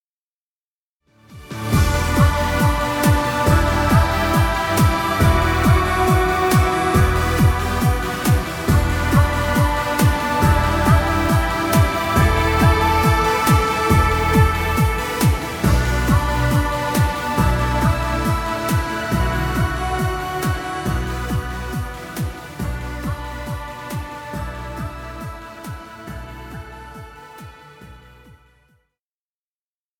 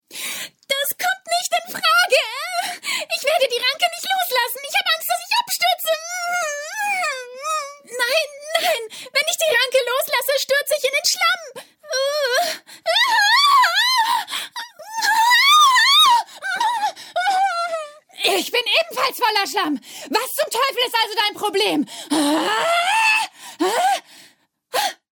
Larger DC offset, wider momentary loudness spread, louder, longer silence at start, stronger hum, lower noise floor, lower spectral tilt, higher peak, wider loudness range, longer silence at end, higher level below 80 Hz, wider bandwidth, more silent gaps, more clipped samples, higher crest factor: neither; about the same, 14 LU vs 12 LU; about the same, -18 LUFS vs -18 LUFS; first, 1.3 s vs 0.1 s; neither; first, under -90 dBFS vs -54 dBFS; first, -5.5 dB/octave vs 0.5 dB/octave; about the same, -2 dBFS vs -4 dBFS; first, 14 LU vs 6 LU; first, 2 s vs 0.25 s; first, -26 dBFS vs -78 dBFS; about the same, 19 kHz vs 19.5 kHz; neither; neither; about the same, 16 dB vs 16 dB